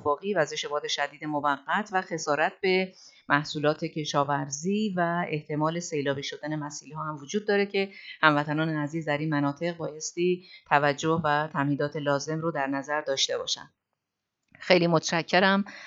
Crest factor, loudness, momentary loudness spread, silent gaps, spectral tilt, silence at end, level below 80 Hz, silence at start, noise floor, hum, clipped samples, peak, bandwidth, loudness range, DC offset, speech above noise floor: 24 dB; -27 LUFS; 10 LU; none; -4.5 dB/octave; 0 s; -74 dBFS; 0 s; -84 dBFS; none; under 0.1%; -2 dBFS; 8 kHz; 2 LU; under 0.1%; 57 dB